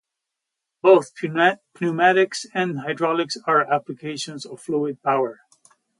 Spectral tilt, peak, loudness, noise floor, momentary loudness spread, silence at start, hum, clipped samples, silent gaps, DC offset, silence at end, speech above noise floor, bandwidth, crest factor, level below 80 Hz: -5 dB/octave; -2 dBFS; -21 LUFS; -83 dBFS; 13 LU; 0.85 s; none; under 0.1%; none; under 0.1%; 0.65 s; 62 dB; 11.5 kHz; 20 dB; -74 dBFS